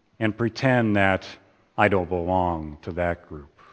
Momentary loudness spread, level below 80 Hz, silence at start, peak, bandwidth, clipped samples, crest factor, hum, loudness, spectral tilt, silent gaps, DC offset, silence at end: 15 LU; -48 dBFS; 0.2 s; -2 dBFS; 8.8 kHz; under 0.1%; 22 dB; none; -24 LUFS; -7.5 dB/octave; none; under 0.1%; 0.25 s